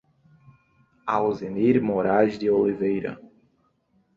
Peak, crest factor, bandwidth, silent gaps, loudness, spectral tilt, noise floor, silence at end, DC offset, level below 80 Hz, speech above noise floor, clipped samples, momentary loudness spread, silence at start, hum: -8 dBFS; 18 dB; 7.2 kHz; none; -23 LUFS; -8.5 dB/octave; -67 dBFS; 0.95 s; under 0.1%; -60 dBFS; 45 dB; under 0.1%; 12 LU; 1.05 s; none